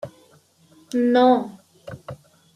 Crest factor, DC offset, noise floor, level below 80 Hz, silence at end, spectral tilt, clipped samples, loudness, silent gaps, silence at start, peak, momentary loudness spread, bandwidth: 18 dB; under 0.1%; -56 dBFS; -66 dBFS; 0.4 s; -6 dB/octave; under 0.1%; -19 LUFS; none; 0.05 s; -4 dBFS; 24 LU; 11 kHz